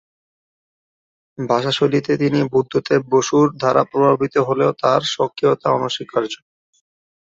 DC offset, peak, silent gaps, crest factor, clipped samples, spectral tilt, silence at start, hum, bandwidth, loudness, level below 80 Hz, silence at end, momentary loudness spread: under 0.1%; -2 dBFS; none; 18 dB; under 0.1%; -5.5 dB/octave; 1.4 s; none; 8 kHz; -18 LUFS; -60 dBFS; 0.85 s; 6 LU